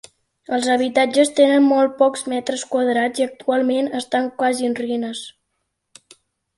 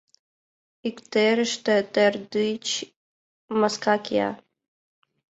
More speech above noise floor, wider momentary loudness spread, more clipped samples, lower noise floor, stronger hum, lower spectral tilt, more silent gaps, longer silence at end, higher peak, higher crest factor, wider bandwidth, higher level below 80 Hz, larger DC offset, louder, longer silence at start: second, 56 dB vs over 67 dB; about the same, 10 LU vs 12 LU; neither; second, -74 dBFS vs under -90 dBFS; neither; about the same, -3 dB/octave vs -3.5 dB/octave; second, none vs 2.96-3.48 s; first, 1.25 s vs 1.05 s; first, -2 dBFS vs -6 dBFS; about the same, 16 dB vs 20 dB; first, 11.5 kHz vs 8.2 kHz; about the same, -68 dBFS vs -70 dBFS; neither; first, -19 LUFS vs -24 LUFS; second, 0.5 s vs 0.85 s